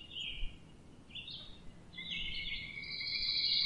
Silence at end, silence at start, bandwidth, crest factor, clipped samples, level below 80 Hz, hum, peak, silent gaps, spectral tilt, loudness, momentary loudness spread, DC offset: 0 s; 0 s; 11 kHz; 20 dB; under 0.1%; -52 dBFS; none; -20 dBFS; none; -2.5 dB/octave; -38 LUFS; 23 LU; under 0.1%